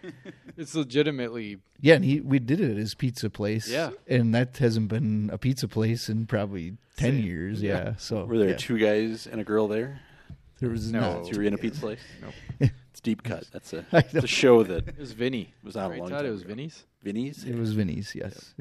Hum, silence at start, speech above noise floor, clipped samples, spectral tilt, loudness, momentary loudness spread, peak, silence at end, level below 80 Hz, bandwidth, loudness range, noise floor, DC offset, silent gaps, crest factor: none; 0.05 s; 23 dB; under 0.1%; -6.5 dB/octave; -27 LUFS; 16 LU; -4 dBFS; 0.15 s; -52 dBFS; 13.5 kHz; 5 LU; -49 dBFS; under 0.1%; none; 24 dB